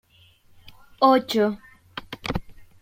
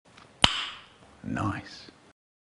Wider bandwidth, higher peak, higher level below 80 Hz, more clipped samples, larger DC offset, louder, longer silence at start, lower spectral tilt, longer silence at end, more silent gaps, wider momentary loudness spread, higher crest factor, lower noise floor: first, 16.5 kHz vs 10.5 kHz; second, -4 dBFS vs 0 dBFS; about the same, -48 dBFS vs -52 dBFS; neither; neither; first, -23 LUFS vs -28 LUFS; first, 1 s vs 0.4 s; first, -5.5 dB/octave vs -3 dB/octave; second, 0.2 s vs 0.5 s; neither; about the same, 20 LU vs 22 LU; second, 20 dB vs 32 dB; first, -56 dBFS vs -51 dBFS